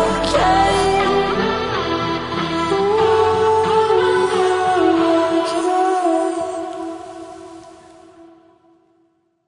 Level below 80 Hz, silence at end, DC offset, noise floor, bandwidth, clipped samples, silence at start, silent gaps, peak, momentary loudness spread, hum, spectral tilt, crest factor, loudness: -42 dBFS; 1.25 s; under 0.1%; -62 dBFS; 11 kHz; under 0.1%; 0 s; none; -4 dBFS; 14 LU; none; -5 dB/octave; 14 dB; -17 LUFS